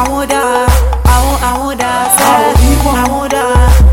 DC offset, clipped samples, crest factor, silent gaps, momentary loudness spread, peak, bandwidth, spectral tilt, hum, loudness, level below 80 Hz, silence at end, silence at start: under 0.1%; 0.2%; 8 dB; none; 6 LU; 0 dBFS; 17 kHz; -4.5 dB/octave; none; -10 LUFS; -12 dBFS; 0 s; 0 s